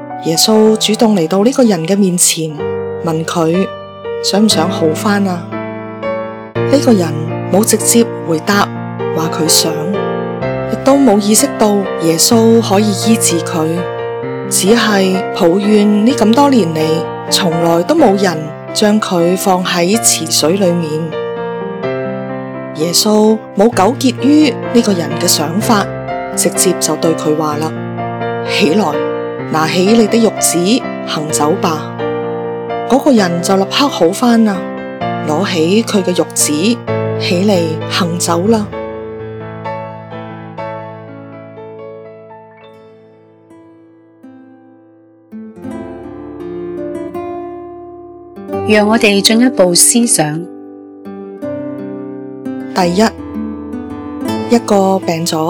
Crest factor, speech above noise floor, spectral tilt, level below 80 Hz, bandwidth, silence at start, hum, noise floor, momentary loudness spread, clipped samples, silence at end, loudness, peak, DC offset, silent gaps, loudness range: 14 dB; 33 dB; -4 dB/octave; -50 dBFS; over 20 kHz; 0 s; none; -44 dBFS; 16 LU; 0.4%; 0 s; -12 LUFS; 0 dBFS; under 0.1%; none; 13 LU